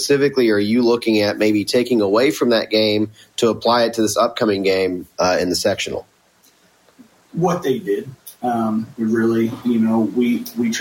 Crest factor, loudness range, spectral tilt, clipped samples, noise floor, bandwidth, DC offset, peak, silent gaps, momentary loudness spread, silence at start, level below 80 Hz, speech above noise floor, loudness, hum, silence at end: 14 dB; 6 LU; -4.5 dB/octave; under 0.1%; -55 dBFS; 16.5 kHz; under 0.1%; -6 dBFS; none; 7 LU; 0 s; -56 dBFS; 38 dB; -18 LUFS; none; 0 s